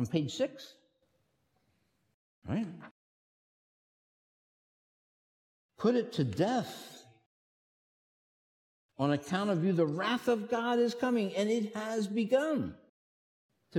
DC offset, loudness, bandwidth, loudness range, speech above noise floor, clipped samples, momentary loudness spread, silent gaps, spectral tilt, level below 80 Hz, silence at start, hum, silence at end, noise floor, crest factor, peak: under 0.1%; -32 LUFS; 16 kHz; 14 LU; 45 dB; under 0.1%; 13 LU; 2.14-2.42 s, 2.91-5.69 s, 7.26-8.89 s, 12.89-13.49 s; -6 dB/octave; -74 dBFS; 0 s; none; 0 s; -76 dBFS; 20 dB; -16 dBFS